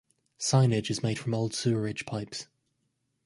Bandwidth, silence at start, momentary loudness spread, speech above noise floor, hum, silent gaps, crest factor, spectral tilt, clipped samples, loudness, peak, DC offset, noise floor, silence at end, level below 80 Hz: 11.5 kHz; 0.4 s; 14 LU; 49 dB; none; none; 20 dB; -5 dB/octave; under 0.1%; -29 LUFS; -10 dBFS; under 0.1%; -77 dBFS; 0.8 s; -62 dBFS